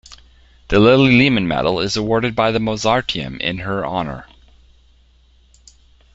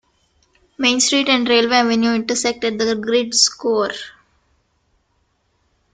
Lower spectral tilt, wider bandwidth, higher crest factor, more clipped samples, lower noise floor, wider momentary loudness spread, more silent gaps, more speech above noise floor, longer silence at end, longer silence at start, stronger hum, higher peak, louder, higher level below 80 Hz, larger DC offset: first, -5.5 dB/octave vs -1.5 dB/octave; second, 8 kHz vs 9.6 kHz; about the same, 18 dB vs 18 dB; neither; second, -52 dBFS vs -65 dBFS; first, 12 LU vs 6 LU; neither; second, 36 dB vs 48 dB; about the same, 1.9 s vs 1.85 s; second, 0.1 s vs 0.8 s; neither; about the same, 0 dBFS vs 0 dBFS; about the same, -16 LUFS vs -16 LUFS; first, -40 dBFS vs -58 dBFS; neither